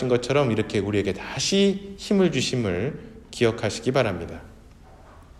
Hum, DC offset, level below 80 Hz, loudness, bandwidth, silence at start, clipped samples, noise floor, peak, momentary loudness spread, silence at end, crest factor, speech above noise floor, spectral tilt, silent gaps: none; under 0.1%; -50 dBFS; -24 LUFS; 13 kHz; 0 s; under 0.1%; -48 dBFS; -6 dBFS; 12 LU; 0.15 s; 18 dB; 24 dB; -5 dB/octave; none